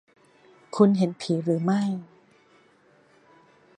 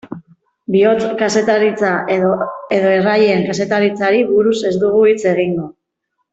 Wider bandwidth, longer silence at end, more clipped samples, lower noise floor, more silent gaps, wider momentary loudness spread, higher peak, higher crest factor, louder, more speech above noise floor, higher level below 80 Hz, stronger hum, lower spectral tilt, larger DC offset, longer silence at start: first, 9.6 kHz vs 8 kHz; first, 1.75 s vs 0.6 s; neither; second, -59 dBFS vs -72 dBFS; neither; first, 13 LU vs 8 LU; about the same, -4 dBFS vs -2 dBFS; first, 22 dB vs 12 dB; second, -24 LUFS vs -14 LUFS; second, 37 dB vs 58 dB; second, -76 dBFS vs -56 dBFS; neither; first, -7.5 dB/octave vs -5.5 dB/octave; neither; first, 0.75 s vs 0.05 s